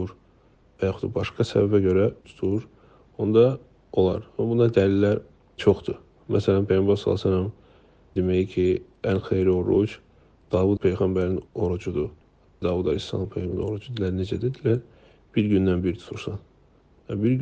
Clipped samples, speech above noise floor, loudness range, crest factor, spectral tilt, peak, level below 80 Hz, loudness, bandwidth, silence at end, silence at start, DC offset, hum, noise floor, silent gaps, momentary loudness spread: under 0.1%; 35 dB; 5 LU; 20 dB; -8.5 dB/octave; -4 dBFS; -52 dBFS; -24 LUFS; 8.2 kHz; 0 s; 0 s; under 0.1%; none; -57 dBFS; none; 10 LU